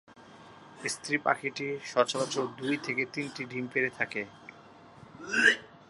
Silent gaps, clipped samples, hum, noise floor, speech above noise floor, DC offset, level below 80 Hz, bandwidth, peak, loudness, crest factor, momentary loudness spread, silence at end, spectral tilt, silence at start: none; under 0.1%; none; -53 dBFS; 23 dB; under 0.1%; -76 dBFS; 11.5 kHz; -8 dBFS; -30 LUFS; 24 dB; 14 LU; 0.05 s; -3 dB/octave; 0.1 s